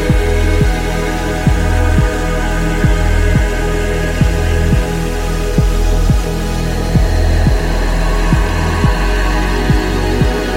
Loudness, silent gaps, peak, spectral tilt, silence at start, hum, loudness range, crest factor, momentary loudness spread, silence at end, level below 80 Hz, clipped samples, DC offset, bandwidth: -15 LUFS; none; 0 dBFS; -6 dB/octave; 0 s; none; 1 LU; 12 dB; 4 LU; 0 s; -14 dBFS; under 0.1%; under 0.1%; 16 kHz